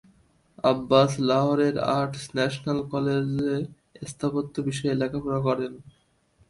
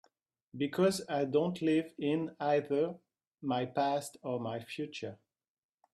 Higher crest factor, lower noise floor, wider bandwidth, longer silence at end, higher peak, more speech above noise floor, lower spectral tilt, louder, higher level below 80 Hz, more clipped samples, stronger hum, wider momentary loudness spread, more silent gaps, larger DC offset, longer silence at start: about the same, 20 dB vs 18 dB; second, -64 dBFS vs -73 dBFS; second, 11.5 kHz vs 13 kHz; second, 0.65 s vs 0.8 s; first, -6 dBFS vs -16 dBFS; about the same, 39 dB vs 40 dB; about the same, -6.5 dB/octave vs -6 dB/octave; first, -25 LUFS vs -34 LUFS; first, -58 dBFS vs -78 dBFS; neither; neither; about the same, 10 LU vs 11 LU; second, none vs 3.27-3.31 s; neither; about the same, 0.6 s vs 0.55 s